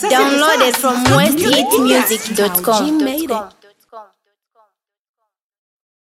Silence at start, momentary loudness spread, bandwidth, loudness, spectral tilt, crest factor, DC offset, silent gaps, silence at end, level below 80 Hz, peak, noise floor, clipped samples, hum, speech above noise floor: 0 s; 6 LU; 17 kHz; -13 LUFS; -3.5 dB/octave; 16 dB; under 0.1%; none; 2 s; -50 dBFS; 0 dBFS; -62 dBFS; under 0.1%; none; 49 dB